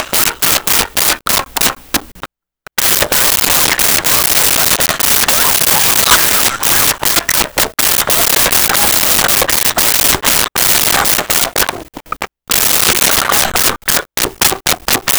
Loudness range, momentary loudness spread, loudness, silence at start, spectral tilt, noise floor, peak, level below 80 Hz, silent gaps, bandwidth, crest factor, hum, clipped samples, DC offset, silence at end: 3 LU; 6 LU; -9 LUFS; 0 s; -0.5 dB/octave; -42 dBFS; 0 dBFS; -36 dBFS; none; over 20 kHz; 12 dB; none; under 0.1%; under 0.1%; 0 s